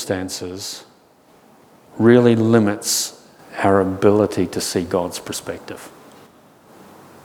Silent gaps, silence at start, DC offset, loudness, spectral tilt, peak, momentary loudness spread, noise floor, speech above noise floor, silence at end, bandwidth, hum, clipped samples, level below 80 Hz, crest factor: none; 0 s; under 0.1%; -18 LUFS; -5 dB/octave; 0 dBFS; 18 LU; -52 dBFS; 34 dB; 1.35 s; 19 kHz; none; under 0.1%; -58 dBFS; 20 dB